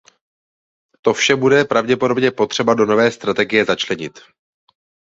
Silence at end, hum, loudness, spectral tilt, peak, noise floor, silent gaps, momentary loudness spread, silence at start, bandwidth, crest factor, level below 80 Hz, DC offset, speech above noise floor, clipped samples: 0.95 s; none; -16 LUFS; -4 dB/octave; -2 dBFS; under -90 dBFS; none; 7 LU; 1.05 s; 7.8 kHz; 16 dB; -58 dBFS; under 0.1%; over 74 dB; under 0.1%